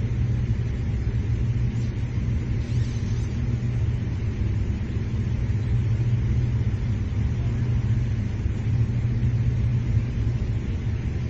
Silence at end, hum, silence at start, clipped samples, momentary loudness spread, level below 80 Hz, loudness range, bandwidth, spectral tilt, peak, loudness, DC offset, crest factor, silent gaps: 0 s; none; 0 s; under 0.1%; 4 LU; -30 dBFS; 2 LU; 7.2 kHz; -8.5 dB/octave; -10 dBFS; -26 LUFS; under 0.1%; 12 dB; none